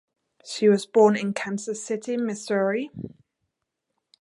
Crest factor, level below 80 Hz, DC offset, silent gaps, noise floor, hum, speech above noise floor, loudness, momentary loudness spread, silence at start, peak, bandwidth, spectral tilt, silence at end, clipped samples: 20 dB; -68 dBFS; under 0.1%; none; -81 dBFS; none; 58 dB; -24 LUFS; 17 LU; 0.45 s; -6 dBFS; 11.5 kHz; -5 dB/octave; 1.15 s; under 0.1%